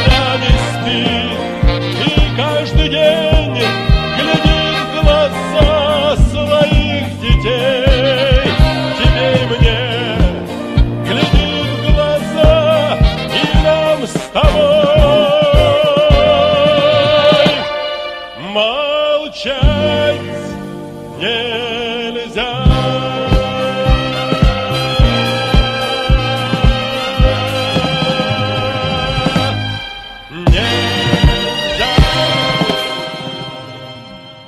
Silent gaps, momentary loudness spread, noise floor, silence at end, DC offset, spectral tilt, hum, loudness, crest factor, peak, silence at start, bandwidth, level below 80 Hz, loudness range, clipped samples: none; 9 LU; -33 dBFS; 0 s; under 0.1%; -6 dB/octave; none; -13 LUFS; 12 dB; 0 dBFS; 0 s; 13 kHz; -18 dBFS; 5 LU; under 0.1%